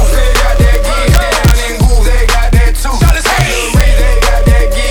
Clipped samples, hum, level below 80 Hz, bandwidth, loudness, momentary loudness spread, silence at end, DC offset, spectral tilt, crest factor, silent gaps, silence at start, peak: under 0.1%; none; -8 dBFS; over 20 kHz; -10 LUFS; 2 LU; 0 s; under 0.1%; -4.5 dB/octave; 8 dB; none; 0 s; 0 dBFS